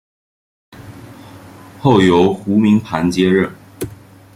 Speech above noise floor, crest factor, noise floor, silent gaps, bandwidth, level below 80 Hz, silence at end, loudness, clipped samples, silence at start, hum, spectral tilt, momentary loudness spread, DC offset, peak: 25 dB; 16 dB; -38 dBFS; none; 16 kHz; -50 dBFS; 0.4 s; -14 LUFS; under 0.1%; 0.8 s; none; -7 dB/octave; 18 LU; under 0.1%; 0 dBFS